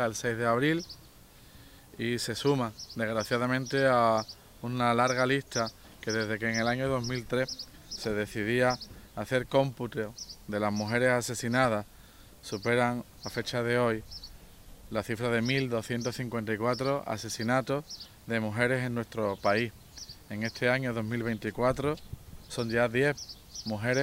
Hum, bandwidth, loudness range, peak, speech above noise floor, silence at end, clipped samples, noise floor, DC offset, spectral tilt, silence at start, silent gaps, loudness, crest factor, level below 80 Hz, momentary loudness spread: none; 16.5 kHz; 3 LU; -12 dBFS; 25 dB; 0 s; under 0.1%; -54 dBFS; under 0.1%; -5 dB/octave; 0 s; none; -30 LUFS; 20 dB; -56 dBFS; 14 LU